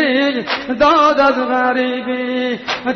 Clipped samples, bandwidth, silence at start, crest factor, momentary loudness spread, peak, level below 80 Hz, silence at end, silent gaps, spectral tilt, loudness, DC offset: under 0.1%; 6.4 kHz; 0 s; 12 dB; 9 LU; -2 dBFS; -48 dBFS; 0 s; none; -4 dB/octave; -15 LUFS; under 0.1%